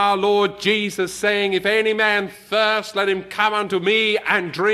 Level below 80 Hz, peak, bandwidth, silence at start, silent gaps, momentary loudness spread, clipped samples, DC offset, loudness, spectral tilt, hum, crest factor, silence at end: -60 dBFS; -4 dBFS; 14 kHz; 0 s; none; 4 LU; under 0.1%; under 0.1%; -19 LUFS; -3.5 dB/octave; none; 16 dB; 0 s